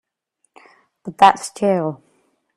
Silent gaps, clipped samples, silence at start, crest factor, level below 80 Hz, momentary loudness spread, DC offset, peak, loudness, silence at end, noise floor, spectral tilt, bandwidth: none; under 0.1%; 1.05 s; 20 dB; -66 dBFS; 23 LU; under 0.1%; 0 dBFS; -17 LUFS; 0.6 s; -70 dBFS; -4.5 dB/octave; 14 kHz